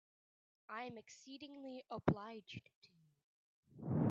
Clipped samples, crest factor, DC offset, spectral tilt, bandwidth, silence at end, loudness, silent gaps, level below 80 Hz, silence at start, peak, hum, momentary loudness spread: under 0.1%; 26 dB; under 0.1%; -6.5 dB/octave; 7.6 kHz; 0 s; -45 LUFS; 2.75-2.82 s, 3.24-3.63 s; -72 dBFS; 0.7 s; -20 dBFS; none; 15 LU